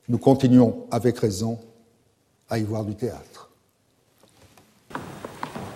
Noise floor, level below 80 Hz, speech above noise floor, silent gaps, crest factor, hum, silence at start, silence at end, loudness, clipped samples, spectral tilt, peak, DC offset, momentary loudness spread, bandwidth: -65 dBFS; -58 dBFS; 44 dB; none; 22 dB; none; 0.1 s; 0 s; -22 LUFS; under 0.1%; -7.5 dB/octave; -4 dBFS; under 0.1%; 21 LU; 15 kHz